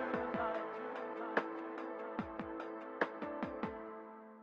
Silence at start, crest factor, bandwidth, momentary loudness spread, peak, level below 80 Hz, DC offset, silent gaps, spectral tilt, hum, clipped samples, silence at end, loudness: 0 s; 24 dB; 7.6 kHz; 8 LU; -18 dBFS; -70 dBFS; under 0.1%; none; -7 dB/octave; none; under 0.1%; 0 s; -42 LUFS